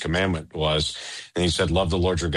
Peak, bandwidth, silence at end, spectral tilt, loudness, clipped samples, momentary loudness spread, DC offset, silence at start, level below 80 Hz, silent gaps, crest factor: -10 dBFS; 11.5 kHz; 0 s; -5 dB/octave; -24 LUFS; under 0.1%; 6 LU; under 0.1%; 0 s; -36 dBFS; none; 14 dB